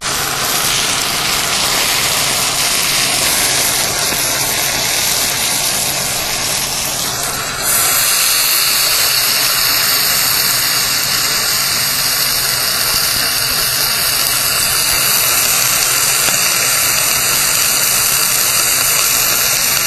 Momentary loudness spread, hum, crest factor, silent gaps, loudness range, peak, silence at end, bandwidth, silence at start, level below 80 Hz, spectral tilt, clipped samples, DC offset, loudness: 4 LU; none; 14 dB; none; 3 LU; 0 dBFS; 0 s; over 20 kHz; 0 s; -40 dBFS; 0.5 dB/octave; under 0.1%; under 0.1%; -11 LUFS